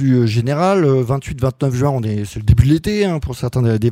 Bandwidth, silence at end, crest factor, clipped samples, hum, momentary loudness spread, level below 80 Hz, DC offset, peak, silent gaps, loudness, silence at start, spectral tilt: 15 kHz; 0 s; 16 dB; under 0.1%; none; 7 LU; -30 dBFS; under 0.1%; 0 dBFS; none; -16 LUFS; 0 s; -7.5 dB/octave